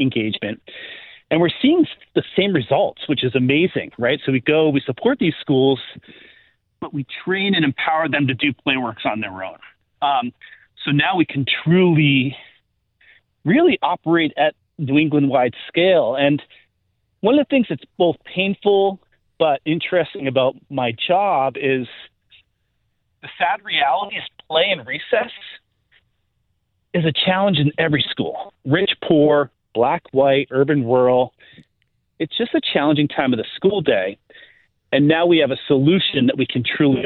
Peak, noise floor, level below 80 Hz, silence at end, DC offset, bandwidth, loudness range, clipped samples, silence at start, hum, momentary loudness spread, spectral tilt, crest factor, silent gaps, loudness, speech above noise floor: -2 dBFS; -69 dBFS; -60 dBFS; 0 s; under 0.1%; 4.4 kHz; 4 LU; under 0.1%; 0 s; none; 11 LU; -10.5 dB/octave; 16 dB; none; -18 LUFS; 51 dB